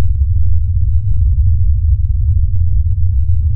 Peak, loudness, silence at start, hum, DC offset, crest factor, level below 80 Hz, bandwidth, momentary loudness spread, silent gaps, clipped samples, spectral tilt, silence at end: -2 dBFS; -15 LUFS; 0 s; none; under 0.1%; 8 dB; -14 dBFS; 0.3 kHz; 2 LU; none; under 0.1%; -22.5 dB/octave; 0 s